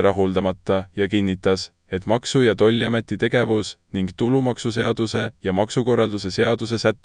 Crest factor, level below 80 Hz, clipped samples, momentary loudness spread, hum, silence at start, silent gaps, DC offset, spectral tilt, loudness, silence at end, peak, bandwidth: 16 dB; -52 dBFS; under 0.1%; 6 LU; none; 0 s; none; under 0.1%; -6 dB/octave; -21 LUFS; 0.1 s; -4 dBFS; 10.5 kHz